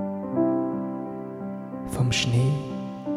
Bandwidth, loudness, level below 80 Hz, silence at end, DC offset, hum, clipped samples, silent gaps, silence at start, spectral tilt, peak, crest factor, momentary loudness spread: 14 kHz; -27 LUFS; -52 dBFS; 0 s; under 0.1%; none; under 0.1%; none; 0 s; -6 dB/octave; -12 dBFS; 14 dB; 12 LU